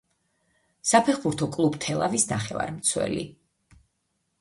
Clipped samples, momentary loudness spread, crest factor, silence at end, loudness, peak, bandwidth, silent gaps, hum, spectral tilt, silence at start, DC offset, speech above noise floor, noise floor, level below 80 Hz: under 0.1%; 9 LU; 22 dB; 1.1 s; -25 LUFS; -6 dBFS; 11.5 kHz; none; none; -4 dB/octave; 0.85 s; under 0.1%; 51 dB; -76 dBFS; -58 dBFS